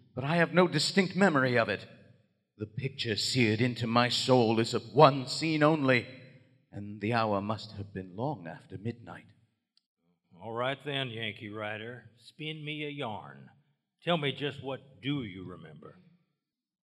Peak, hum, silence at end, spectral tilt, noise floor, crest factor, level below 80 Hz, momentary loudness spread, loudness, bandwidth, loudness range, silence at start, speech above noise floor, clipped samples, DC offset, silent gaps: -6 dBFS; none; 0.9 s; -5.5 dB/octave; -85 dBFS; 26 dB; -76 dBFS; 20 LU; -29 LUFS; 14.5 kHz; 12 LU; 0.15 s; 55 dB; under 0.1%; under 0.1%; 9.86-9.97 s